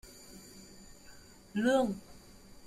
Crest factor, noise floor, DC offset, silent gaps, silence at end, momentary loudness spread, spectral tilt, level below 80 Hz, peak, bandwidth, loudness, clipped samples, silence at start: 20 dB; -54 dBFS; under 0.1%; none; 0 s; 26 LU; -5 dB/octave; -62 dBFS; -18 dBFS; 16 kHz; -32 LUFS; under 0.1%; 0.05 s